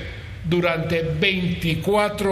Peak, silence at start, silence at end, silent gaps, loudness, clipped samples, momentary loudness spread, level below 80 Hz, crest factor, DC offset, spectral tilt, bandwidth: -4 dBFS; 0 s; 0 s; none; -21 LUFS; under 0.1%; 5 LU; -40 dBFS; 18 dB; under 0.1%; -6 dB/octave; 15 kHz